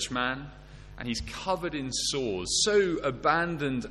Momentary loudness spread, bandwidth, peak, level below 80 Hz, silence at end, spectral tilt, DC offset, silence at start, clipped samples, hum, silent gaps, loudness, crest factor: 10 LU; 12.5 kHz; -10 dBFS; -48 dBFS; 0 s; -3 dB/octave; under 0.1%; 0 s; under 0.1%; none; none; -28 LUFS; 20 dB